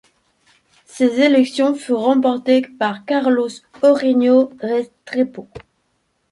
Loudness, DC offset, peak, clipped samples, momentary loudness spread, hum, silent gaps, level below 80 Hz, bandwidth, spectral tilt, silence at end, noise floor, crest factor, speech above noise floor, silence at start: -17 LUFS; under 0.1%; -2 dBFS; under 0.1%; 9 LU; none; none; -62 dBFS; 11.5 kHz; -5 dB/octave; 0.7 s; -67 dBFS; 16 dB; 51 dB; 0.95 s